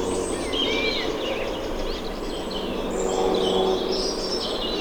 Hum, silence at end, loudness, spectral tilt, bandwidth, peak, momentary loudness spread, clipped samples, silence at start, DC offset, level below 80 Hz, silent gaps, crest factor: none; 0 s; -25 LUFS; -3.5 dB/octave; over 20 kHz; -10 dBFS; 8 LU; under 0.1%; 0 s; under 0.1%; -38 dBFS; none; 14 dB